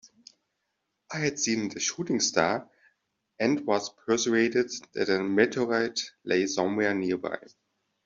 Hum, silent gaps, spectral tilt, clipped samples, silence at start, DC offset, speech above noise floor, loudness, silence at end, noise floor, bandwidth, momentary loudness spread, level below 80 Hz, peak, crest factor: none; none; -3.5 dB/octave; under 0.1%; 1.1 s; under 0.1%; 53 dB; -27 LUFS; 0.7 s; -80 dBFS; 7.8 kHz; 8 LU; -70 dBFS; -6 dBFS; 22 dB